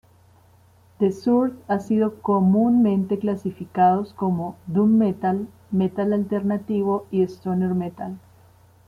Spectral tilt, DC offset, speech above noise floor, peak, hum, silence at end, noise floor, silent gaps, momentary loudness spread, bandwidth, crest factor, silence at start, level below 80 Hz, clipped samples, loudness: -9.5 dB/octave; under 0.1%; 33 dB; -6 dBFS; none; 0.7 s; -54 dBFS; none; 9 LU; 7.2 kHz; 16 dB; 1 s; -62 dBFS; under 0.1%; -22 LUFS